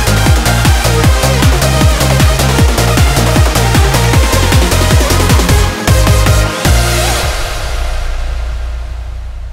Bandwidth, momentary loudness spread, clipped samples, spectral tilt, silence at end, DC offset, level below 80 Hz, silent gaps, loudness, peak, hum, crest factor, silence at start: 16.5 kHz; 11 LU; under 0.1%; -4.5 dB/octave; 0 s; under 0.1%; -14 dBFS; none; -10 LUFS; 0 dBFS; none; 10 dB; 0 s